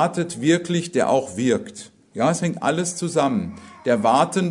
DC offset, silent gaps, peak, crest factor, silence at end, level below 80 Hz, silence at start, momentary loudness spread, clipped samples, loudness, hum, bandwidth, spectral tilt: under 0.1%; none; -4 dBFS; 18 dB; 0 s; -62 dBFS; 0 s; 10 LU; under 0.1%; -21 LUFS; none; 11 kHz; -5 dB/octave